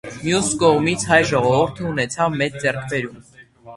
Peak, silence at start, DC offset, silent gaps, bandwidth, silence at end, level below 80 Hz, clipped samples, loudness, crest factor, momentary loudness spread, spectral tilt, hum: 0 dBFS; 0.05 s; under 0.1%; none; 11.5 kHz; 0 s; -48 dBFS; under 0.1%; -19 LUFS; 20 dB; 9 LU; -4.5 dB/octave; none